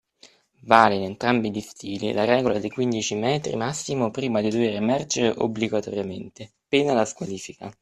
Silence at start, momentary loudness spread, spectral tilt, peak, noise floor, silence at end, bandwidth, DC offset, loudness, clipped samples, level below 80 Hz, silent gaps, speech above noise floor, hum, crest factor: 0.25 s; 13 LU; -4.5 dB/octave; 0 dBFS; -55 dBFS; 0.1 s; 12.5 kHz; under 0.1%; -23 LUFS; under 0.1%; -60 dBFS; none; 32 dB; none; 24 dB